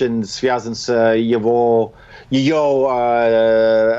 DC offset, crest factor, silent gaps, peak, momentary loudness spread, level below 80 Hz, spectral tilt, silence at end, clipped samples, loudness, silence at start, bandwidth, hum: under 0.1%; 12 dB; none; -4 dBFS; 6 LU; -50 dBFS; -5.5 dB/octave; 0 s; under 0.1%; -16 LUFS; 0 s; 8 kHz; none